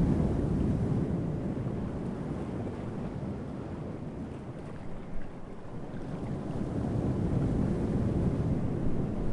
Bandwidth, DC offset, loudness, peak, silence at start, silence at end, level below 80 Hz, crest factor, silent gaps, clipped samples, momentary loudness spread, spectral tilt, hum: 11 kHz; under 0.1%; -33 LUFS; -16 dBFS; 0 s; 0 s; -42 dBFS; 16 dB; none; under 0.1%; 13 LU; -9.5 dB/octave; none